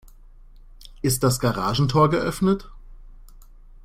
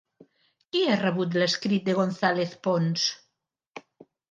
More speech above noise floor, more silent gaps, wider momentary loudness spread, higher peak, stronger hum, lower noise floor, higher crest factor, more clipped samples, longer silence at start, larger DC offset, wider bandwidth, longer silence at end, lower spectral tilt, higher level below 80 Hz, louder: second, 25 dB vs 54 dB; second, none vs 3.67-3.71 s; second, 6 LU vs 22 LU; about the same, -6 dBFS vs -8 dBFS; neither; second, -46 dBFS vs -79 dBFS; about the same, 18 dB vs 20 dB; neither; about the same, 0.8 s vs 0.75 s; neither; first, 16 kHz vs 9 kHz; about the same, 0.45 s vs 0.5 s; about the same, -5.5 dB/octave vs -5 dB/octave; first, -42 dBFS vs -76 dBFS; first, -22 LUFS vs -25 LUFS